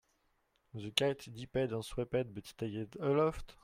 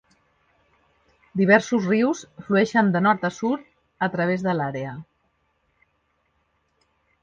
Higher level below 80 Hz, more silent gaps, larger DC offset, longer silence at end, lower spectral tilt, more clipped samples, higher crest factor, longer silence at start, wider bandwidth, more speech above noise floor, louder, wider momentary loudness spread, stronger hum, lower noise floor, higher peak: first, -58 dBFS vs -64 dBFS; neither; neither; second, 0.1 s vs 2.2 s; second, -5 dB/octave vs -6.5 dB/octave; neither; about the same, 26 dB vs 22 dB; second, 0.75 s vs 1.35 s; first, 16 kHz vs 7.6 kHz; second, 40 dB vs 48 dB; second, -36 LUFS vs -22 LUFS; about the same, 12 LU vs 14 LU; neither; first, -77 dBFS vs -70 dBFS; second, -10 dBFS vs -2 dBFS